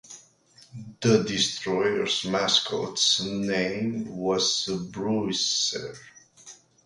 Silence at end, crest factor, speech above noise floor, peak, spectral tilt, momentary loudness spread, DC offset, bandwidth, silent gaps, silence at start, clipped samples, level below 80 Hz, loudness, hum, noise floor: 0.3 s; 20 dB; 31 dB; -8 dBFS; -3 dB/octave; 9 LU; under 0.1%; 11.5 kHz; none; 0.05 s; under 0.1%; -62 dBFS; -25 LUFS; none; -57 dBFS